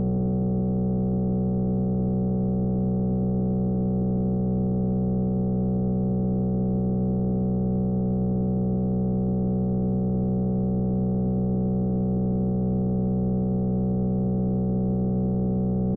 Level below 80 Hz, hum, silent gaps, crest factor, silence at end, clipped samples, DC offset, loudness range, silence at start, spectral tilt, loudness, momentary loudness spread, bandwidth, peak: -38 dBFS; none; none; 8 dB; 0 s; under 0.1%; 0.2%; 0 LU; 0 s; -14.5 dB/octave; -25 LUFS; 0 LU; 1.5 kHz; -16 dBFS